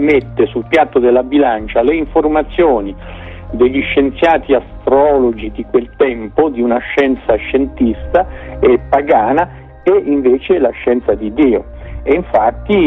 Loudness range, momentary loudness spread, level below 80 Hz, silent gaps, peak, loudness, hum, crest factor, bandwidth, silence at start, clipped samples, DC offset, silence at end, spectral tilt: 1 LU; 6 LU; -32 dBFS; none; 0 dBFS; -13 LUFS; none; 12 dB; 6.2 kHz; 0 s; under 0.1%; under 0.1%; 0 s; -8 dB/octave